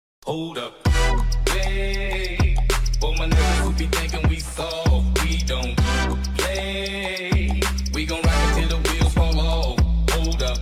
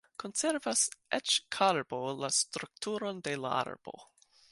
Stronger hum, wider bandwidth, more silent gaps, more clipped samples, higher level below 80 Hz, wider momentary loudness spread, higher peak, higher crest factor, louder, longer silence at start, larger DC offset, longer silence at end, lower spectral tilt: neither; first, 15.5 kHz vs 11.5 kHz; neither; neither; first, -22 dBFS vs -78 dBFS; second, 5 LU vs 10 LU; first, -8 dBFS vs -12 dBFS; second, 14 dB vs 22 dB; first, -22 LUFS vs -32 LUFS; about the same, 0.25 s vs 0.2 s; neither; second, 0 s vs 0.45 s; first, -4.5 dB/octave vs -1.5 dB/octave